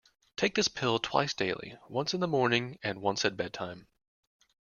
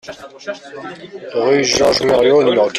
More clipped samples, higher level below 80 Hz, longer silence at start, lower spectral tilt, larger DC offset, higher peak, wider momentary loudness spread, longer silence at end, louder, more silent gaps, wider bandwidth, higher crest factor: neither; second, -66 dBFS vs -48 dBFS; first, 0.4 s vs 0.05 s; about the same, -4 dB/octave vs -3.5 dB/octave; neither; second, -10 dBFS vs -2 dBFS; second, 12 LU vs 19 LU; first, 0.9 s vs 0 s; second, -31 LUFS vs -13 LUFS; neither; second, 7.4 kHz vs 13.5 kHz; first, 22 dB vs 14 dB